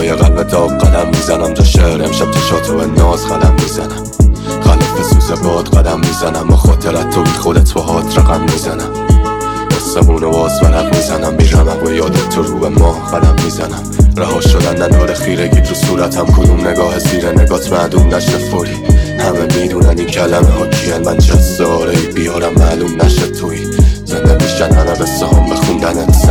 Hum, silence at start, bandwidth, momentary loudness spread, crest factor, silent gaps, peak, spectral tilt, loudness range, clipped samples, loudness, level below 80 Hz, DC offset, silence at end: none; 0 s; 17.5 kHz; 4 LU; 10 dB; none; 0 dBFS; -6 dB/octave; 1 LU; under 0.1%; -11 LUFS; -14 dBFS; under 0.1%; 0 s